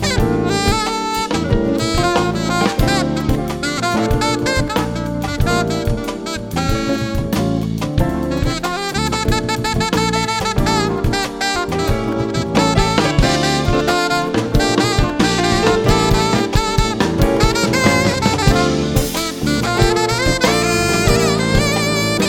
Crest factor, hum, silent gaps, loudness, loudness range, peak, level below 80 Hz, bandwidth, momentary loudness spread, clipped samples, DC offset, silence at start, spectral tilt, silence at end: 16 dB; none; none; -16 LUFS; 4 LU; 0 dBFS; -26 dBFS; 18 kHz; 5 LU; under 0.1%; under 0.1%; 0 s; -4.5 dB/octave; 0 s